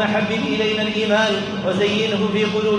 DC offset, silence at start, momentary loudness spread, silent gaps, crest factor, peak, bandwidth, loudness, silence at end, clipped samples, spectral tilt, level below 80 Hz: under 0.1%; 0 s; 3 LU; none; 14 dB; -6 dBFS; 10.5 kHz; -19 LUFS; 0 s; under 0.1%; -5 dB/octave; -54 dBFS